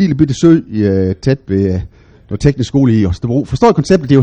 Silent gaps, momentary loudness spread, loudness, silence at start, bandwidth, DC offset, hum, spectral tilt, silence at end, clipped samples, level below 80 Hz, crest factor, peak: none; 6 LU; -13 LUFS; 0 s; 9.6 kHz; under 0.1%; none; -7.5 dB/octave; 0 s; 0.2%; -32 dBFS; 12 dB; 0 dBFS